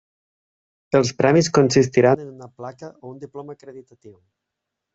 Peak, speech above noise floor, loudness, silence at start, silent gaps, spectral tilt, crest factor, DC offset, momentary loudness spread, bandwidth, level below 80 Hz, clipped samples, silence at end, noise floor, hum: -2 dBFS; 62 dB; -17 LUFS; 0.95 s; none; -5.5 dB/octave; 20 dB; under 0.1%; 22 LU; 8 kHz; -58 dBFS; under 0.1%; 0.85 s; -82 dBFS; none